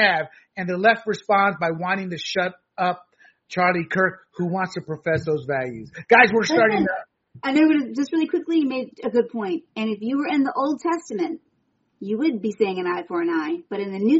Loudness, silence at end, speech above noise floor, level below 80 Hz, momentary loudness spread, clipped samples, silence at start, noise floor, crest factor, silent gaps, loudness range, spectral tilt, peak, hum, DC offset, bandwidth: -22 LUFS; 0 s; 47 dB; -64 dBFS; 11 LU; under 0.1%; 0 s; -69 dBFS; 22 dB; none; 6 LU; -3.5 dB/octave; 0 dBFS; none; under 0.1%; 8 kHz